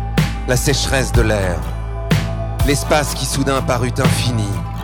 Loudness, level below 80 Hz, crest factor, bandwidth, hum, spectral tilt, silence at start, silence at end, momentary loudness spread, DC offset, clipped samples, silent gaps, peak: -17 LUFS; -24 dBFS; 16 dB; 19 kHz; none; -5 dB/octave; 0 s; 0 s; 6 LU; under 0.1%; under 0.1%; none; 0 dBFS